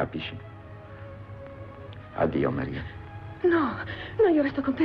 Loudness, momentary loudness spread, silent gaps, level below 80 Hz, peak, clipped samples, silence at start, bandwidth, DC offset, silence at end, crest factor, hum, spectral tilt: -27 LUFS; 20 LU; none; -50 dBFS; -14 dBFS; under 0.1%; 0 s; 5.6 kHz; under 0.1%; 0 s; 14 dB; none; -9 dB/octave